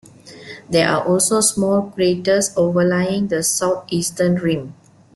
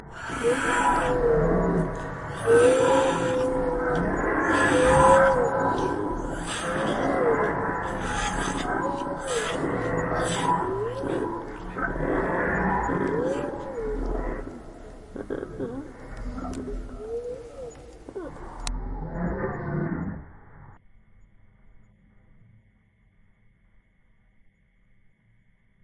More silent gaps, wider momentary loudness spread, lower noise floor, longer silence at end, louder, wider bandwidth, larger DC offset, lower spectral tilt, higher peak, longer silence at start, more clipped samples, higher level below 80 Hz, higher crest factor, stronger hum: neither; second, 7 LU vs 18 LU; second, -39 dBFS vs -62 dBFS; second, 0.45 s vs 4.05 s; first, -17 LUFS vs -25 LUFS; about the same, 12.5 kHz vs 11.5 kHz; neither; second, -4 dB/octave vs -5.5 dB/octave; about the same, -4 dBFS vs -4 dBFS; first, 0.25 s vs 0 s; neither; second, -54 dBFS vs -40 dBFS; second, 16 dB vs 22 dB; neither